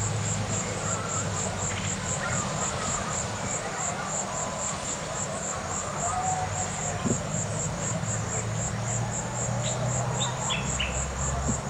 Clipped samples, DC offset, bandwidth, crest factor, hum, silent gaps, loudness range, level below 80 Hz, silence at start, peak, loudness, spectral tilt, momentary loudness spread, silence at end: under 0.1%; under 0.1%; 16 kHz; 18 dB; none; none; 1 LU; -44 dBFS; 0 s; -12 dBFS; -29 LUFS; -3.5 dB/octave; 3 LU; 0 s